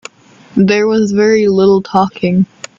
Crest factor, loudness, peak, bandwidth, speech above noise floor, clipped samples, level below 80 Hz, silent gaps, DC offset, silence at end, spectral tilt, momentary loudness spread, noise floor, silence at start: 12 dB; -12 LUFS; 0 dBFS; 7.6 kHz; 31 dB; under 0.1%; -50 dBFS; none; under 0.1%; 0.35 s; -6.5 dB/octave; 5 LU; -41 dBFS; 0.55 s